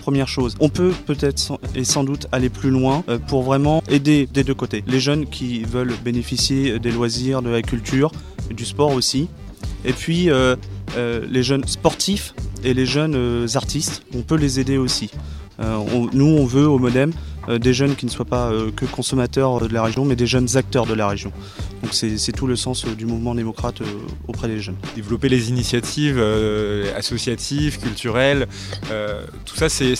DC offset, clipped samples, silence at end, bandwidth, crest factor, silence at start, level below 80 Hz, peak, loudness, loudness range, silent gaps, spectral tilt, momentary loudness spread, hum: under 0.1%; under 0.1%; 0 s; 14.5 kHz; 18 dB; 0 s; -34 dBFS; 0 dBFS; -20 LUFS; 4 LU; none; -5 dB/octave; 10 LU; none